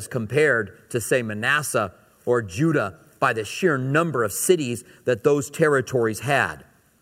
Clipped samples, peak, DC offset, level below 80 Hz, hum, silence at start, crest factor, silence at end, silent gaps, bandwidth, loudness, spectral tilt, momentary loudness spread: under 0.1%; -4 dBFS; under 0.1%; -60 dBFS; none; 0 s; 18 dB; 0.4 s; none; 16 kHz; -22 LUFS; -5 dB/octave; 8 LU